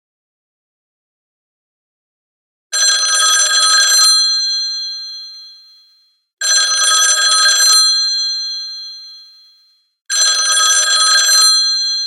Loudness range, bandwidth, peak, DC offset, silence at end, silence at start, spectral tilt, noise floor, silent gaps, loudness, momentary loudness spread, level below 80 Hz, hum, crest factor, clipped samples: 3 LU; 14.5 kHz; 0 dBFS; under 0.1%; 0 s; 2.7 s; 8.5 dB/octave; -54 dBFS; 6.33-6.37 s, 10.01-10.05 s; -10 LUFS; 16 LU; -88 dBFS; none; 14 dB; under 0.1%